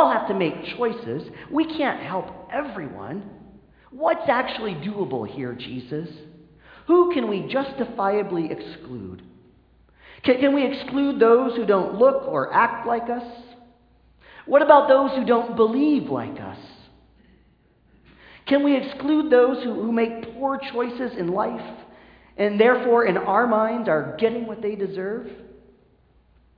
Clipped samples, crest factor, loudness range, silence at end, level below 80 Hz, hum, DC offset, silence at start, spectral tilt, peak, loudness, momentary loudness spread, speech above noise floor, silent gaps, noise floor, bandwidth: under 0.1%; 22 dB; 7 LU; 1.1 s; -60 dBFS; none; under 0.1%; 0 s; -9 dB/octave; 0 dBFS; -22 LUFS; 16 LU; 37 dB; none; -59 dBFS; 5.2 kHz